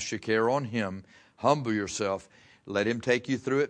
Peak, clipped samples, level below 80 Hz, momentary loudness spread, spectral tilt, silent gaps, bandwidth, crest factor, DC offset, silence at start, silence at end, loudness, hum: -8 dBFS; under 0.1%; -66 dBFS; 8 LU; -5 dB/octave; none; 10.5 kHz; 22 dB; under 0.1%; 0 s; 0 s; -29 LUFS; none